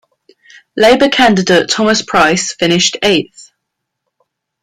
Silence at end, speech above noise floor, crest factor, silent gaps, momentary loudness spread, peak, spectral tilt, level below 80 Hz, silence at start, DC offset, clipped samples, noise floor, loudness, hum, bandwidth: 1.2 s; 63 dB; 14 dB; none; 5 LU; 0 dBFS; -3.5 dB/octave; -48 dBFS; 0.75 s; under 0.1%; under 0.1%; -74 dBFS; -10 LUFS; none; 16 kHz